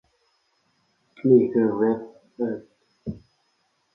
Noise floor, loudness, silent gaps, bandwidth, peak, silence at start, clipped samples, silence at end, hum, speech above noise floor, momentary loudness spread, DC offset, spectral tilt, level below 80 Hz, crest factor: -70 dBFS; -22 LUFS; none; 5.4 kHz; -4 dBFS; 1.25 s; under 0.1%; 0.75 s; none; 49 dB; 20 LU; under 0.1%; -11 dB/octave; -60 dBFS; 20 dB